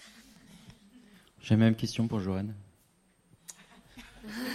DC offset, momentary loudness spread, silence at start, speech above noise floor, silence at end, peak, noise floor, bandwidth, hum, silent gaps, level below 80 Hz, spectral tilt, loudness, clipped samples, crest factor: under 0.1%; 27 LU; 0 s; 39 dB; 0 s; -12 dBFS; -67 dBFS; 15 kHz; none; none; -62 dBFS; -6.5 dB/octave; -30 LUFS; under 0.1%; 22 dB